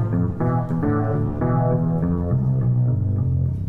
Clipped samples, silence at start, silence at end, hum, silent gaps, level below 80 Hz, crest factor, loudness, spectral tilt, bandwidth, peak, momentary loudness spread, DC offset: under 0.1%; 0 s; 0 s; none; none; -36 dBFS; 12 dB; -21 LUFS; -12.5 dB/octave; 2.4 kHz; -8 dBFS; 3 LU; under 0.1%